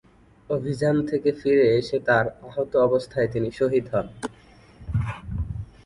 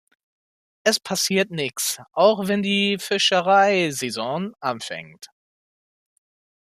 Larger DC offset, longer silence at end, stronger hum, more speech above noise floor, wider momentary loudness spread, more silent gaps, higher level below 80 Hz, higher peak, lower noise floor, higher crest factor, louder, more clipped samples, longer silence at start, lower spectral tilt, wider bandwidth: neither; second, 0.2 s vs 1.35 s; neither; second, 28 dB vs over 69 dB; about the same, 12 LU vs 11 LU; neither; first, -42 dBFS vs -70 dBFS; about the same, -6 dBFS vs -4 dBFS; second, -50 dBFS vs under -90 dBFS; about the same, 18 dB vs 20 dB; second, -24 LUFS vs -21 LUFS; neither; second, 0.5 s vs 0.85 s; first, -7.5 dB/octave vs -3 dB/octave; second, 11 kHz vs 15 kHz